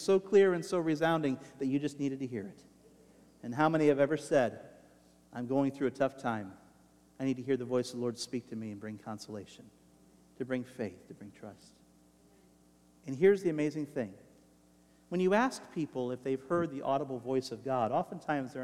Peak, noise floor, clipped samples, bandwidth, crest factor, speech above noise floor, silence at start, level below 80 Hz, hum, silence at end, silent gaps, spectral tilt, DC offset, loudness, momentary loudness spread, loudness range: -14 dBFS; -64 dBFS; under 0.1%; 13.5 kHz; 20 dB; 32 dB; 0 s; -74 dBFS; none; 0 s; none; -6 dB/octave; under 0.1%; -33 LUFS; 18 LU; 11 LU